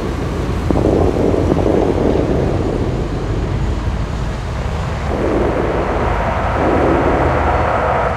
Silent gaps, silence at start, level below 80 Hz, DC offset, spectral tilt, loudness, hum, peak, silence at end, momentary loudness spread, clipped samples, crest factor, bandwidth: none; 0 s; -22 dBFS; under 0.1%; -7.5 dB/octave; -17 LUFS; none; 0 dBFS; 0 s; 7 LU; under 0.1%; 16 dB; 11.5 kHz